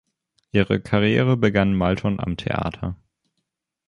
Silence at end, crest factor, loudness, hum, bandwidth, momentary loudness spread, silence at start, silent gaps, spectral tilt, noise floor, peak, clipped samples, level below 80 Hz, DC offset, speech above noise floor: 0.9 s; 18 dB; -21 LUFS; none; 10.5 kHz; 11 LU; 0.55 s; none; -8 dB/octave; -78 dBFS; -4 dBFS; under 0.1%; -42 dBFS; under 0.1%; 58 dB